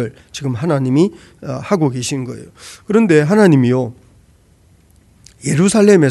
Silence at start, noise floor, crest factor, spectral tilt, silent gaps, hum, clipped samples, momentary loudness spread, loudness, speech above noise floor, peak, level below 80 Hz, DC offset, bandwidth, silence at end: 0 s; -50 dBFS; 16 dB; -6.5 dB/octave; none; none; under 0.1%; 18 LU; -14 LUFS; 36 dB; 0 dBFS; -52 dBFS; under 0.1%; 12 kHz; 0 s